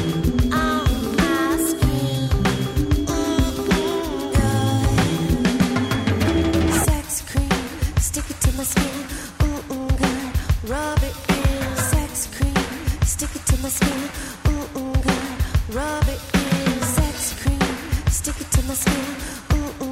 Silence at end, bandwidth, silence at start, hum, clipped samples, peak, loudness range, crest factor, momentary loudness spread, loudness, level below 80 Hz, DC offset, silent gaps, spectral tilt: 0 s; 16 kHz; 0 s; none; under 0.1%; -6 dBFS; 3 LU; 14 dB; 5 LU; -21 LUFS; -26 dBFS; under 0.1%; none; -5 dB/octave